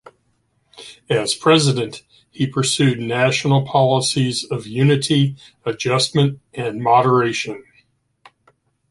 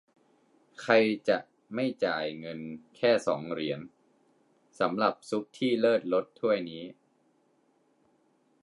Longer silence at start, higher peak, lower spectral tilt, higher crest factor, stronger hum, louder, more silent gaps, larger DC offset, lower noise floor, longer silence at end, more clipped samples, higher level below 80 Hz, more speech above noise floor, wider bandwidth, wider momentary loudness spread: about the same, 0.75 s vs 0.8 s; first, -2 dBFS vs -8 dBFS; about the same, -5 dB/octave vs -5.5 dB/octave; second, 16 dB vs 22 dB; neither; first, -18 LUFS vs -29 LUFS; neither; neither; second, -65 dBFS vs -69 dBFS; second, 1.3 s vs 1.7 s; neither; first, -58 dBFS vs -76 dBFS; first, 47 dB vs 41 dB; about the same, 11.5 kHz vs 11.5 kHz; about the same, 13 LU vs 15 LU